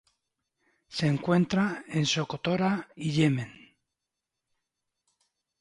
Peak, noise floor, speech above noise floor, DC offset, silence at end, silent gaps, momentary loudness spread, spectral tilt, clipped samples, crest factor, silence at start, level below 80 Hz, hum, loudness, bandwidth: -12 dBFS; -87 dBFS; 60 dB; under 0.1%; 2.1 s; none; 7 LU; -5.5 dB/octave; under 0.1%; 18 dB; 0.9 s; -64 dBFS; none; -28 LUFS; 11 kHz